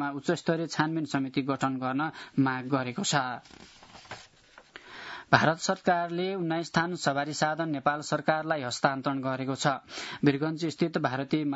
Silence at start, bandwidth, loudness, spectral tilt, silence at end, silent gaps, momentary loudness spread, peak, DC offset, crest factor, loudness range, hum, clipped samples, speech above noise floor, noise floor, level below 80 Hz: 0 s; 8 kHz; -29 LUFS; -5 dB/octave; 0 s; none; 10 LU; -2 dBFS; under 0.1%; 26 dB; 3 LU; none; under 0.1%; 28 dB; -57 dBFS; -70 dBFS